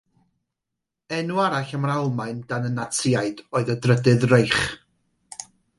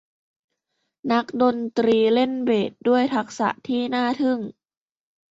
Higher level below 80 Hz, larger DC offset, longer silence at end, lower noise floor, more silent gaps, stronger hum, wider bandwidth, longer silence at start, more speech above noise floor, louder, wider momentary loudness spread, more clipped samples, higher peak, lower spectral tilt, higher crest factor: first, -54 dBFS vs -68 dBFS; neither; second, 0.35 s vs 0.8 s; first, -83 dBFS vs -77 dBFS; neither; neither; first, 11.5 kHz vs 7.8 kHz; about the same, 1.1 s vs 1.05 s; first, 62 dB vs 56 dB; about the same, -22 LUFS vs -22 LUFS; first, 18 LU vs 7 LU; neither; first, -2 dBFS vs -6 dBFS; about the same, -5.5 dB/octave vs -5.5 dB/octave; about the same, 20 dB vs 16 dB